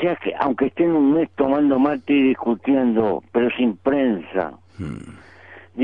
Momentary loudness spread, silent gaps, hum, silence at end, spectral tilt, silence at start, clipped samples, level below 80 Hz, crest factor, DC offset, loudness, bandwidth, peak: 15 LU; none; none; 0 s; -8.5 dB/octave; 0 s; under 0.1%; -54 dBFS; 16 dB; 0.2%; -20 LUFS; 4.2 kHz; -4 dBFS